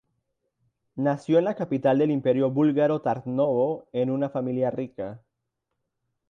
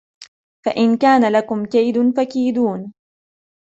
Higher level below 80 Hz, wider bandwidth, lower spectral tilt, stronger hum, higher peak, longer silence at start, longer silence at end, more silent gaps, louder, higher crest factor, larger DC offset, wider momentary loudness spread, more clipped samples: second, -70 dBFS vs -64 dBFS; about the same, 8.8 kHz vs 8 kHz; first, -9 dB/octave vs -6.5 dB/octave; neither; second, -10 dBFS vs -4 dBFS; first, 0.95 s vs 0.2 s; first, 1.15 s vs 0.75 s; second, none vs 0.28-0.63 s; second, -25 LUFS vs -17 LUFS; about the same, 16 dB vs 14 dB; neither; second, 9 LU vs 12 LU; neither